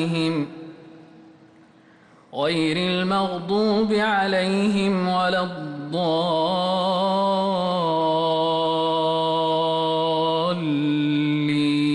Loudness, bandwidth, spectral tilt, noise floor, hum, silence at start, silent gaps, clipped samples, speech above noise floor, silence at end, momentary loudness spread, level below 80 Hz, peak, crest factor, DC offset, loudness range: -22 LUFS; 11 kHz; -6.5 dB/octave; -52 dBFS; none; 0 s; none; under 0.1%; 31 dB; 0 s; 5 LU; -62 dBFS; -12 dBFS; 10 dB; under 0.1%; 3 LU